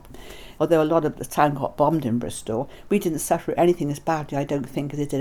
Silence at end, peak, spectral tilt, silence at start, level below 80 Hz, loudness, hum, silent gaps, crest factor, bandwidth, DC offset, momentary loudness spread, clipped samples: 0 s; -4 dBFS; -6 dB/octave; 0.05 s; -48 dBFS; -23 LUFS; none; none; 20 dB; 19.5 kHz; under 0.1%; 9 LU; under 0.1%